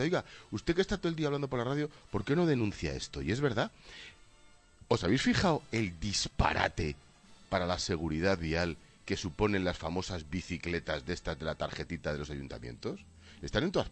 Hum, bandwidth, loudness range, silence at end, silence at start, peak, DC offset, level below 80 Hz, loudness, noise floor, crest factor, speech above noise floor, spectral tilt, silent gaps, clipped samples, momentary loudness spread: none; 10 kHz; 5 LU; 0 s; 0 s; -12 dBFS; under 0.1%; -48 dBFS; -33 LUFS; -60 dBFS; 22 dB; 27 dB; -5 dB/octave; none; under 0.1%; 12 LU